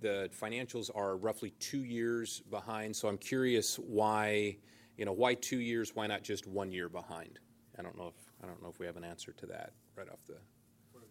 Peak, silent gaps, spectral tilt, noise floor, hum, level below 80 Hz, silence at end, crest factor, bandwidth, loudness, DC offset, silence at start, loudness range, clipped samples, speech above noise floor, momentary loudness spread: -16 dBFS; none; -4 dB/octave; -63 dBFS; none; -78 dBFS; 0.05 s; 22 dB; 16.5 kHz; -37 LUFS; under 0.1%; 0 s; 15 LU; under 0.1%; 26 dB; 20 LU